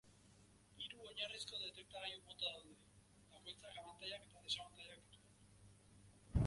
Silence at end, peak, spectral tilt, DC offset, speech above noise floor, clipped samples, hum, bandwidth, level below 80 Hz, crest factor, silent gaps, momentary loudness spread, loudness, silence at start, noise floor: 0 s; -26 dBFS; -4.5 dB/octave; under 0.1%; 17 dB; under 0.1%; 50 Hz at -70 dBFS; 11.5 kHz; -58 dBFS; 24 dB; none; 22 LU; -49 LUFS; 0.05 s; -69 dBFS